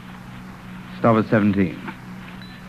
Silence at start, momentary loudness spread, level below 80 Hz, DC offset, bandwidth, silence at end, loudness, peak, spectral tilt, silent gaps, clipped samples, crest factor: 0 s; 20 LU; -52 dBFS; under 0.1%; 13.5 kHz; 0 s; -19 LUFS; -4 dBFS; -8.5 dB/octave; none; under 0.1%; 20 dB